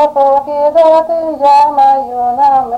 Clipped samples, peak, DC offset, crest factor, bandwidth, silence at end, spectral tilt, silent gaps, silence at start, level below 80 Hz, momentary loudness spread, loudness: under 0.1%; 0 dBFS; under 0.1%; 8 dB; 9.6 kHz; 0 s; -5 dB/octave; none; 0 s; -50 dBFS; 5 LU; -9 LUFS